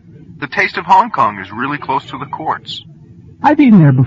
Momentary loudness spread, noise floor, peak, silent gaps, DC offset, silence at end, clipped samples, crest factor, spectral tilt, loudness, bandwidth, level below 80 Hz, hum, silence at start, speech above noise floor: 17 LU; -38 dBFS; 0 dBFS; none; under 0.1%; 0 s; under 0.1%; 14 dB; -8 dB/octave; -13 LUFS; 7.6 kHz; -52 dBFS; none; 0.3 s; 26 dB